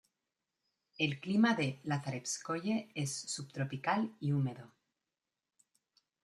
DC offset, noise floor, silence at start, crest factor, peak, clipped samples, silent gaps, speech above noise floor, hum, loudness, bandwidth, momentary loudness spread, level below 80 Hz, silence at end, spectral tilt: under 0.1%; under -90 dBFS; 1 s; 20 dB; -16 dBFS; under 0.1%; none; over 55 dB; none; -35 LUFS; 12.5 kHz; 9 LU; -78 dBFS; 1.55 s; -5 dB/octave